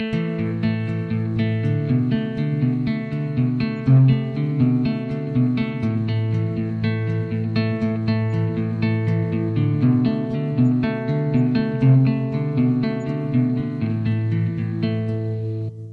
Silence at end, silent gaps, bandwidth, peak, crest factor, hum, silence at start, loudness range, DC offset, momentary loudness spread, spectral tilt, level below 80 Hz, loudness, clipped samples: 0 s; none; 4.9 kHz; -6 dBFS; 14 dB; none; 0 s; 3 LU; under 0.1%; 6 LU; -10 dB/octave; -50 dBFS; -21 LUFS; under 0.1%